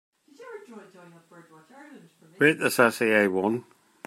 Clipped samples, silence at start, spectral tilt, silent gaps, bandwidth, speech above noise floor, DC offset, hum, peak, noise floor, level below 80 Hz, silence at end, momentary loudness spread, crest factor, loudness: under 0.1%; 0.4 s; -4.5 dB/octave; none; 16 kHz; 19 dB; under 0.1%; none; -4 dBFS; -45 dBFS; -76 dBFS; 0.45 s; 23 LU; 24 dB; -23 LUFS